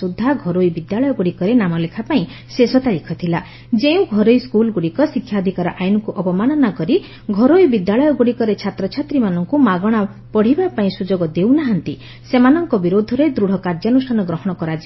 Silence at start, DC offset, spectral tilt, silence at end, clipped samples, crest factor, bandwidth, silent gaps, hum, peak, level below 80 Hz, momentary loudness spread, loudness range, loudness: 0 s; under 0.1%; -8.5 dB/octave; 0 s; under 0.1%; 16 dB; 6 kHz; none; none; 0 dBFS; -48 dBFS; 8 LU; 2 LU; -16 LUFS